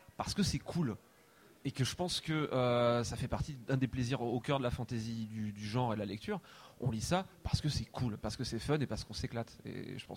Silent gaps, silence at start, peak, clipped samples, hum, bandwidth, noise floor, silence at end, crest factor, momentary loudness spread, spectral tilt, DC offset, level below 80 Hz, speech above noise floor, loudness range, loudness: none; 0.2 s; -18 dBFS; under 0.1%; none; 16 kHz; -63 dBFS; 0 s; 18 dB; 10 LU; -5.5 dB/octave; under 0.1%; -54 dBFS; 27 dB; 3 LU; -37 LUFS